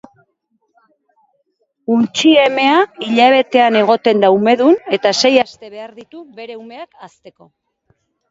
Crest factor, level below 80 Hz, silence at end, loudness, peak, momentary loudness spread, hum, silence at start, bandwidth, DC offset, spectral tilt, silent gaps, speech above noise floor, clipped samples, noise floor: 16 dB; -66 dBFS; 1 s; -12 LUFS; 0 dBFS; 22 LU; none; 1.9 s; 7.8 kHz; under 0.1%; -4 dB/octave; none; 52 dB; under 0.1%; -66 dBFS